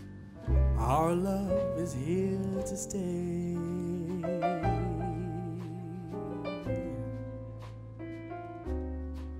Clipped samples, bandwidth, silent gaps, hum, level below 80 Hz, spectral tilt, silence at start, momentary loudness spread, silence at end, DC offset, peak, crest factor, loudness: under 0.1%; 16 kHz; none; none; -40 dBFS; -7.5 dB/octave; 0 s; 14 LU; 0 s; under 0.1%; -16 dBFS; 16 dB; -34 LUFS